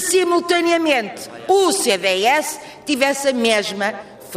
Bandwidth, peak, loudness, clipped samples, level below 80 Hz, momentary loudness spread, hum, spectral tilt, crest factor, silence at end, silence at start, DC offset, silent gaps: 15.5 kHz; -4 dBFS; -17 LUFS; under 0.1%; -62 dBFS; 12 LU; none; -2 dB/octave; 14 dB; 0 s; 0 s; under 0.1%; none